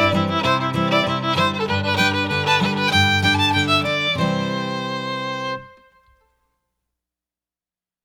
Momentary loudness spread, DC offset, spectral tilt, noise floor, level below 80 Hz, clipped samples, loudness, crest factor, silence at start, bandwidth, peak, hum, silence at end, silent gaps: 9 LU; under 0.1%; -4.5 dB/octave; under -90 dBFS; -54 dBFS; under 0.1%; -19 LUFS; 18 dB; 0 s; 18.5 kHz; -4 dBFS; none; 2.35 s; none